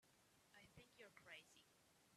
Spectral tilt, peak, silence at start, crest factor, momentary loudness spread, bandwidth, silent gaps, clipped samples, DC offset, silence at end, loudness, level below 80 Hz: -2.5 dB/octave; -46 dBFS; 0 s; 22 dB; 6 LU; 13.5 kHz; none; under 0.1%; under 0.1%; 0 s; -65 LUFS; -90 dBFS